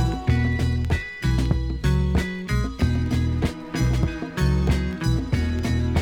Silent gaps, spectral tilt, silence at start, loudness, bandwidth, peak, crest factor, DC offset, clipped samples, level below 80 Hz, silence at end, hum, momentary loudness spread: none; -6.5 dB/octave; 0 s; -24 LUFS; 15.5 kHz; -8 dBFS; 14 dB; under 0.1%; under 0.1%; -28 dBFS; 0 s; none; 4 LU